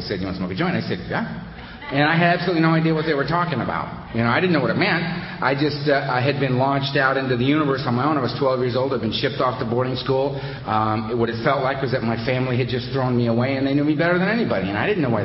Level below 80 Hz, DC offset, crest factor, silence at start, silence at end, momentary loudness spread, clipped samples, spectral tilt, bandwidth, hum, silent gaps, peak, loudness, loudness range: -48 dBFS; under 0.1%; 18 dB; 0 s; 0 s; 7 LU; under 0.1%; -11 dB/octave; 5.8 kHz; none; none; -2 dBFS; -21 LUFS; 2 LU